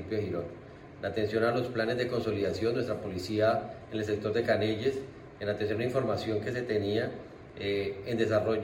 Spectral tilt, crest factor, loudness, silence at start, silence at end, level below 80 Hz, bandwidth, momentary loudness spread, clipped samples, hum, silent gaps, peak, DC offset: -6.5 dB/octave; 18 dB; -31 LUFS; 0 s; 0 s; -60 dBFS; 16 kHz; 10 LU; under 0.1%; none; none; -14 dBFS; under 0.1%